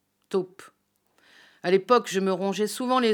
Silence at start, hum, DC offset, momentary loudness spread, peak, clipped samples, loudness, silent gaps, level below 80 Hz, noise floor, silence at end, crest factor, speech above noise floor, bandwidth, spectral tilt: 0.3 s; none; under 0.1%; 10 LU; -6 dBFS; under 0.1%; -25 LUFS; none; under -90 dBFS; -68 dBFS; 0 s; 20 dB; 44 dB; 19 kHz; -4.5 dB/octave